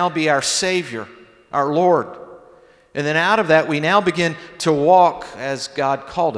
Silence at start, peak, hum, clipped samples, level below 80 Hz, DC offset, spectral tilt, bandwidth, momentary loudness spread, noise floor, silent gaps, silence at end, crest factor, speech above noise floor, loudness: 0 s; -2 dBFS; none; under 0.1%; -58 dBFS; under 0.1%; -4 dB/octave; 11 kHz; 15 LU; -49 dBFS; none; 0 s; 18 dB; 31 dB; -18 LUFS